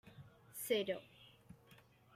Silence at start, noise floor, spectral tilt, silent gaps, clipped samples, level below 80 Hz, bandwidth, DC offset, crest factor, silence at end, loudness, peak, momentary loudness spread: 0.05 s; -66 dBFS; -3.5 dB/octave; none; under 0.1%; -80 dBFS; 16 kHz; under 0.1%; 22 dB; 0.4 s; -41 LUFS; -24 dBFS; 24 LU